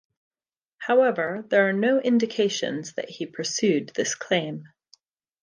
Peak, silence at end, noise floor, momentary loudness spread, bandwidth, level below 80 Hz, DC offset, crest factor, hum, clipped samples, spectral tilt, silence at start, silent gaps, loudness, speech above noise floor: -6 dBFS; 0.75 s; -82 dBFS; 13 LU; 10 kHz; -76 dBFS; under 0.1%; 18 dB; none; under 0.1%; -4 dB/octave; 0.8 s; none; -24 LUFS; 59 dB